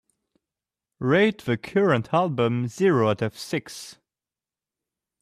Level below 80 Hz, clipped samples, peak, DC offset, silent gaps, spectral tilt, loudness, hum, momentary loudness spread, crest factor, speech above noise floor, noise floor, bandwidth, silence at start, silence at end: -64 dBFS; under 0.1%; -8 dBFS; under 0.1%; none; -6.5 dB/octave; -23 LUFS; none; 10 LU; 18 dB; over 67 dB; under -90 dBFS; 14.5 kHz; 1 s; 1.3 s